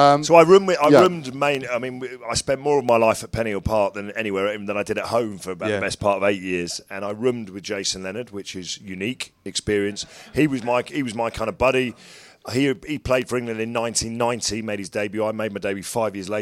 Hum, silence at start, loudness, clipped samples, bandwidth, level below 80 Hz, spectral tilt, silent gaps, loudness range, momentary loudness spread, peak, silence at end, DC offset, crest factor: none; 0 s; -22 LUFS; under 0.1%; 16.5 kHz; -48 dBFS; -4.5 dB/octave; none; 6 LU; 14 LU; 0 dBFS; 0 s; under 0.1%; 22 dB